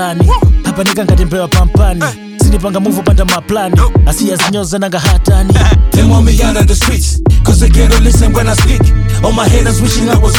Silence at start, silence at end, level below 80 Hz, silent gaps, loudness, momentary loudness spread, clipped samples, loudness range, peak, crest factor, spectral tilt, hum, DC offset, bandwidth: 0 s; 0 s; -10 dBFS; none; -10 LUFS; 4 LU; under 0.1%; 2 LU; 0 dBFS; 8 dB; -5.5 dB/octave; none; under 0.1%; 19 kHz